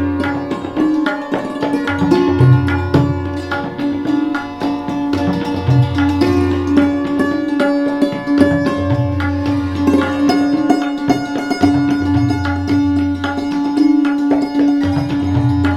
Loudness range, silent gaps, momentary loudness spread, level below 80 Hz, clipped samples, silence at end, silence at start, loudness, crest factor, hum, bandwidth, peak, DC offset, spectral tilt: 1 LU; none; 6 LU; -40 dBFS; under 0.1%; 0 s; 0 s; -16 LUFS; 14 dB; none; 11 kHz; 0 dBFS; under 0.1%; -7.5 dB/octave